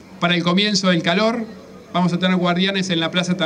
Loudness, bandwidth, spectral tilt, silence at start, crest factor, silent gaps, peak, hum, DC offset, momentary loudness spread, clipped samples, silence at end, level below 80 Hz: -18 LUFS; 9.6 kHz; -5 dB/octave; 0.1 s; 12 dB; none; -6 dBFS; none; under 0.1%; 5 LU; under 0.1%; 0 s; -62 dBFS